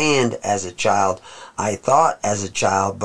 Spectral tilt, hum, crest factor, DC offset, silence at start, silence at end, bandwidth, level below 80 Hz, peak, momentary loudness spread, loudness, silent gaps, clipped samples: -3.5 dB/octave; none; 18 dB; 0.7%; 0 s; 0 s; 11 kHz; -56 dBFS; -2 dBFS; 9 LU; -19 LUFS; none; under 0.1%